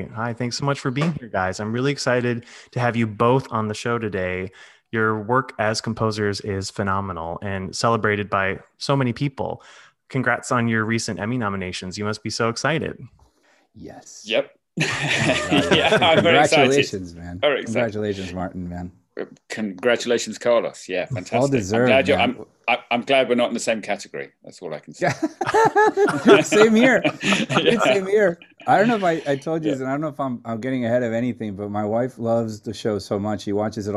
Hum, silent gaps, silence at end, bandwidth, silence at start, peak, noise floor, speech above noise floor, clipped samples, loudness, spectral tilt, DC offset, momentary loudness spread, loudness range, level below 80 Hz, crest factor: none; none; 0 s; 13 kHz; 0 s; 0 dBFS; -60 dBFS; 39 dB; under 0.1%; -21 LUFS; -5 dB/octave; under 0.1%; 14 LU; 7 LU; -56 dBFS; 22 dB